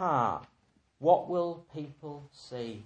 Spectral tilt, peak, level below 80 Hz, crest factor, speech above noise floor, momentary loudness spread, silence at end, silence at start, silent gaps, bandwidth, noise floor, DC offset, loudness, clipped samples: -7.5 dB/octave; -10 dBFS; -70 dBFS; 22 dB; 34 dB; 19 LU; 0 s; 0 s; none; 8.8 kHz; -65 dBFS; under 0.1%; -30 LUFS; under 0.1%